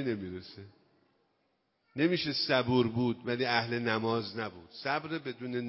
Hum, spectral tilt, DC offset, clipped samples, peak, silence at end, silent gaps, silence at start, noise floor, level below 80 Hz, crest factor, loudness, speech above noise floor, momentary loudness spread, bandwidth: none; -9 dB/octave; under 0.1%; under 0.1%; -12 dBFS; 0 s; none; 0 s; -76 dBFS; -64 dBFS; 22 dB; -32 LUFS; 44 dB; 14 LU; 5.8 kHz